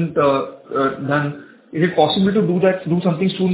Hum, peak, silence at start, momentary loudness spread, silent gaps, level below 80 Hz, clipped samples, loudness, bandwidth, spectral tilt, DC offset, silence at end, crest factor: none; -2 dBFS; 0 s; 9 LU; none; -56 dBFS; under 0.1%; -18 LUFS; 4 kHz; -11 dB/octave; under 0.1%; 0 s; 16 dB